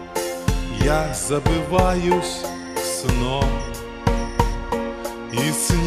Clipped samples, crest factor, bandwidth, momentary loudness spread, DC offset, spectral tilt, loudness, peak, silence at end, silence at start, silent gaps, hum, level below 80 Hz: under 0.1%; 20 dB; 16 kHz; 8 LU; under 0.1%; -4.5 dB/octave; -22 LUFS; -2 dBFS; 0 s; 0 s; none; none; -28 dBFS